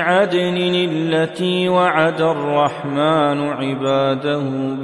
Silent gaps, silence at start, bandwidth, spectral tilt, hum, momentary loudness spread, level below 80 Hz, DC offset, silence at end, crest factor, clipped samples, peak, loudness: none; 0 s; 11.5 kHz; -6.5 dB/octave; none; 5 LU; -66 dBFS; under 0.1%; 0 s; 16 dB; under 0.1%; -2 dBFS; -17 LUFS